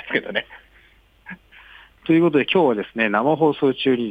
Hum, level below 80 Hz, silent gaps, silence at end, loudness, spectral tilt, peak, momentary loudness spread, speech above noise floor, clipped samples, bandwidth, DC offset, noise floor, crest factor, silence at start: none; -58 dBFS; none; 0 s; -19 LUFS; -8 dB/octave; -6 dBFS; 23 LU; 35 dB; under 0.1%; 4.9 kHz; under 0.1%; -54 dBFS; 16 dB; 0.05 s